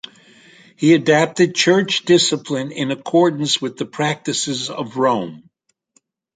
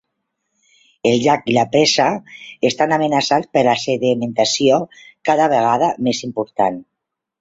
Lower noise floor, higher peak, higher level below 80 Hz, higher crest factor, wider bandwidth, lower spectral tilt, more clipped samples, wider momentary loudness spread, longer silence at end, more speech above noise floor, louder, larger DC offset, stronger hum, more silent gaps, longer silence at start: second, -62 dBFS vs -80 dBFS; about the same, -2 dBFS vs 0 dBFS; about the same, -64 dBFS vs -60 dBFS; about the same, 18 dB vs 16 dB; first, 9.4 kHz vs 8 kHz; about the same, -4 dB/octave vs -4 dB/octave; neither; about the same, 10 LU vs 8 LU; first, 0.95 s vs 0.6 s; second, 45 dB vs 63 dB; about the same, -17 LUFS vs -17 LUFS; neither; neither; neither; second, 0.8 s vs 1.05 s